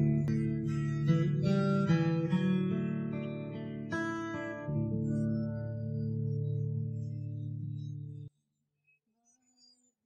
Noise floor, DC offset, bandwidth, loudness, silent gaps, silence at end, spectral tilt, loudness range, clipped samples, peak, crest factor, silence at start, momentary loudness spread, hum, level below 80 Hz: -81 dBFS; under 0.1%; 8.2 kHz; -33 LUFS; none; 1.75 s; -8.5 dB/octave; 9 LU; under 0.1%; -16 dBFS; 16 dB; 0 s; 11 LU; none; -60 dBFS